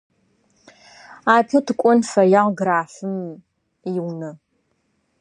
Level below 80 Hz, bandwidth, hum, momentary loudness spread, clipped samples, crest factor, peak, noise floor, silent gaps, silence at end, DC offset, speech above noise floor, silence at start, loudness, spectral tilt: -72 dBFS; 11 kHz; none; 17 LU; under 0.1%; 20 dB; -2 dBFS; -68 dBFS; none; 0.85 s; under 0.1%; 50 dB; 1.1 s; -19 LUFS; -6 dB/octave